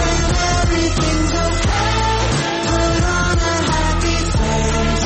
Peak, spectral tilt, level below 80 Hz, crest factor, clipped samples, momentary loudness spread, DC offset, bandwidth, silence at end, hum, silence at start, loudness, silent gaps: -6 dBFS; -4.5 dB/octave; -22 dBFS; 10 dB; under 0.1%; 2 LU; under 0.1%; 8.8 kHz; 0 s; none; 0 s; -17 LUFS; none